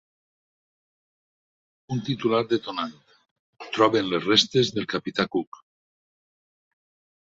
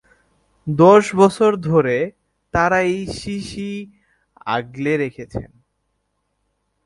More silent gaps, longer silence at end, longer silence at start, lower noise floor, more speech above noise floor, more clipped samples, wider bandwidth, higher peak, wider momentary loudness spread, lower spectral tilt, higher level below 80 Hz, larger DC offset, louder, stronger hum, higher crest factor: first, 3.31-3.53 s vs none; first, 1.8 s vs 1.4 s; first, 1.9 s vs 0.65 s; first, under -90 dBFS vs -71 dBFS; first, over 66 dB vs 54 dB; neither; second, 8 kHz vs 11.5 kHz; second, -4 dBFS vs 0 dBFS; second, 13 LU vs 20 LU; second, -4.5 dB/octave vs -6.5 dB/octave; second, -66 dBFS vs -46 dBFS; neither; second, -24 LUFS vs -18 LUFS; neither; first, 24 dB vs 18 dB